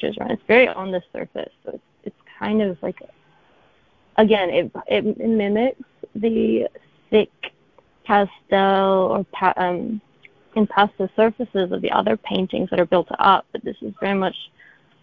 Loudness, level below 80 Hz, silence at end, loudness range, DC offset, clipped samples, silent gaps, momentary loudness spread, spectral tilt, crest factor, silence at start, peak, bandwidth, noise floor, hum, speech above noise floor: -20 LUFS; -56 dBFS; 0.55 s; 3 LU; under 0.1%; under 0.1%; none; 19 LU; -8.5 dB/octave; 20 dB; 0 s; 0 dBFS; 5 kHz; -58 dBFS; none; 38 dB